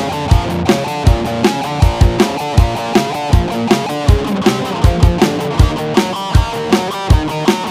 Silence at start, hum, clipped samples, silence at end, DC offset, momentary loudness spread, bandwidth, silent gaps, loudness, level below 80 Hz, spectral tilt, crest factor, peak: 0 s; none; 0.7%; 0 s; under 0.1%; 3 LU; 16 kHz; none; -14 LUFS; -18 dBFS; -6 dB/octave; 12 dB; 0 dBFS